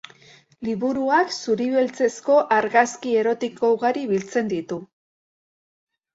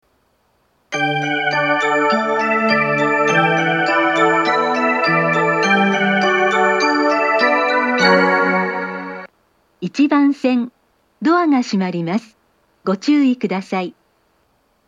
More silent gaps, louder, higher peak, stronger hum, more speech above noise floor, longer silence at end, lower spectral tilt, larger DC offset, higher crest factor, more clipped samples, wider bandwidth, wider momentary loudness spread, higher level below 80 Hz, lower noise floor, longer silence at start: neither; second, -21 LUFS vs -16 LUFS; second, -4 dBFS vs 0 dBFS; neither; second, 30 dB vs 45 dB; first, 1.3 s vs 0.95 s; about the same, -4.5 dB/octave vs -5.5 dB/octave; neither; about the same, 18 dB vs 16 dB; neither; second, 8 kHz vs 10 kHz; about the same, 10 LU vs 10 LU; about the same, -66 dBFS vs -70 dBFS; second, -51 dBFS vs -61 dBFS; second, 0.6 s vs 0.9 s